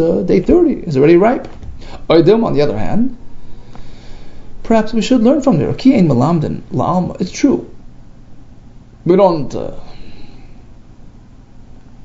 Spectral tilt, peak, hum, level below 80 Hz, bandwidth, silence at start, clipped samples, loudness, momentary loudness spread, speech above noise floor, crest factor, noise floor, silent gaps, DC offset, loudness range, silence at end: -7.5 dB/octave; 0 dBFS; none; -32 dBFS; 7.8 kHz; 0 s; under 0.1%; -13 LUFS; 13 LU; 26 dB; 14 dB; -38 dBFS; none; under 0.1%; 6 LU; 0 s